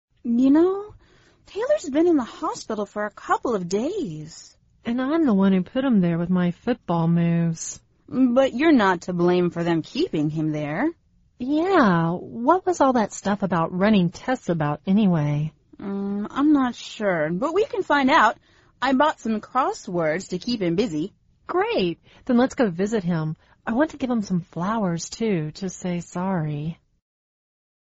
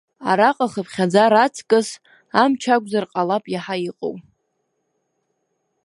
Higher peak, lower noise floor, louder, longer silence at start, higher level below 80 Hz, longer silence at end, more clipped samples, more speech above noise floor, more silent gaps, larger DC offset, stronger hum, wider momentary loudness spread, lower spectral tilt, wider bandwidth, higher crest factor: second, -4 dBFS vs 0 dBFS; second, -56 dBFS vs -72 dBFS; second, -23 LUFS vs -19 LUFS; about the same, 0.25 s vs 0.2 s; first, -56 dBFS vs -70 dBFS; second, 1.25 s vs 1.65 s; neither; second, 34 dB vs 54 dB; neither; neither; neither; about the same, 12 LU vs 14 LU; about the same, -6 dB/octave vs -5 dB/octave; second, 8 kHz vs 11.5 kHz; about the same, 18 dB vs 20 dB